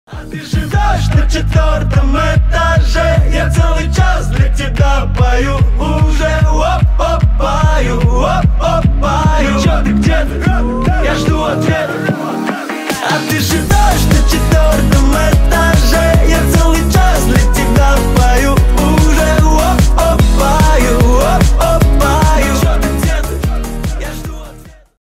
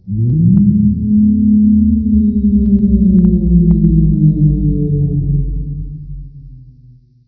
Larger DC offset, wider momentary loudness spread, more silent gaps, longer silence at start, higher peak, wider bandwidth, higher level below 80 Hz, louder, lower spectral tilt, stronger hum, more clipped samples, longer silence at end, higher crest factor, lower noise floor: neither; second, 6 LU vs 13 LU; neither; about the same, 0.1 s vs 0.05 s; about the same, 0 dBFS vs 0 dBFS; first, 16 kHz vs 1 kHz; first, -12 dBFS vs -22 dBFS; about the same, -12 LUFS vs -12 LUFS; second, -5.5 dB/octave vs -16 dB/octave; neither; neither; second, 0.3 s vs 0.7 s; about the same, 10 dB vs 12 dB; second, -35 dBFS vs -43 dBFS